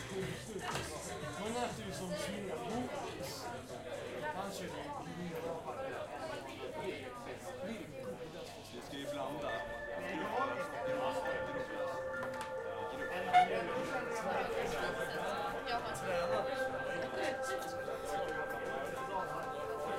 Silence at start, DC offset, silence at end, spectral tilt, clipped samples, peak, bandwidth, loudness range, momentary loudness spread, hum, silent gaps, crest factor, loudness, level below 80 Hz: 0 s; under 0.1%; 0 s; -4 dB/octave; under 0.1%; -18 dBFS; 16 kHz; 7 LU; 8 LU; none; none; 22 dB; -40 LUFS; -62 dBFS